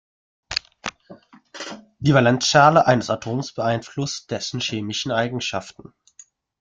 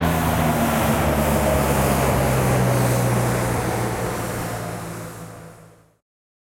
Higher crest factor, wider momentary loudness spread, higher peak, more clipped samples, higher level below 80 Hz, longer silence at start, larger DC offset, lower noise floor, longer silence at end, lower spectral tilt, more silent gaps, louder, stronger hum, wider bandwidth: first, 20 dB vs 14 dB; first, 19 LU vs 13 LU; first, -2 dBFS vs -8 dBFS; neither; second, -56 dBFS vs -34 dBFS; first, 0.5 s vs 0 s; neither; first, -52 dBFS vs -48 dBFS; about the same, 0.9 s vs 0.85 s; about the same, -4.5 dB/octave vs -5.5 dB/octave; neither; about the same, -20 LUFS vs -21 LUFS; neither; second, 9.4 kHz vs 16.5 kHz